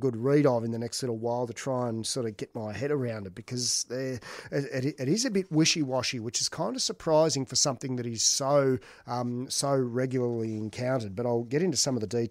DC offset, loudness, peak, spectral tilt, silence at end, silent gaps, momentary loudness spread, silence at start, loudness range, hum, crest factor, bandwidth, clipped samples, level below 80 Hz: under 0.1%; -28 LUFS; -12 dBFS; -4 dB/octave; 0 s; none; 10 LU; 0 s; 5 LU; none; 18 dB; 16 kHz; under 0.1%; -66 dBFS